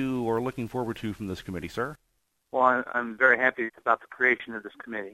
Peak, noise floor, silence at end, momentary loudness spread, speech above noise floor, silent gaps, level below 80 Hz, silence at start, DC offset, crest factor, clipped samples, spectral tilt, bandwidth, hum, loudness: -6 dBFS; -74 dBFS; 0 s; 14 LU; 46 dB; none; -58 dBFS; 0 s; under 0.1%; 22 dB; under 0.1%; -6.5 dB/octave; 15.5 kHz; none; -27 LUFS